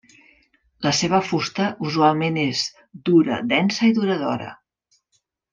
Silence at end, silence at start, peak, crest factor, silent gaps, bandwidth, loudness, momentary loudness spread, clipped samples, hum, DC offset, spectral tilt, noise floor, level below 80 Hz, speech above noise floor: 1 s; 0.8 s; -4 dBFS; 18 dB; none; 9.4 kHz; -21 LUFS; 9 LU; under 0.1%; none; under 0.1%; -5 dB/octave; -70 dBFS; -62 dBFS; 50 dB